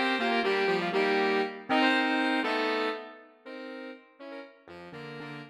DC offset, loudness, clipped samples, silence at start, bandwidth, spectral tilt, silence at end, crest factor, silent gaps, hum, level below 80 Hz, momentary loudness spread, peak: under 0.1%; -27 LUFS; under 0.1%; 0 s; 12 kHz; -4.5 dB/octave; 0 s; 18 dB; none; none; -80 dBFS; 20 LU; -12 dBFS